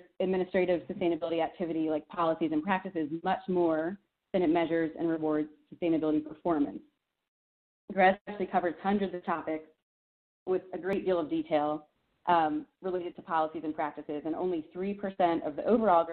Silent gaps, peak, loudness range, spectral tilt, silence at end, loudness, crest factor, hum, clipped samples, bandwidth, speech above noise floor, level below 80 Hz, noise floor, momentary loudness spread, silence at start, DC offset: 7.28-7.88 s, 8.21-8.25 s, 9.82-10.46 s; -12 dBFS; 3 LU; -5 dB/octave; 0 s; -31 LUFS; 20 dB; none; under 0.1%; 4.5 kHz; over 60 dB; -68 dBFS; under -90 dBFS; 9 LU; 0.2 s; under 0.1%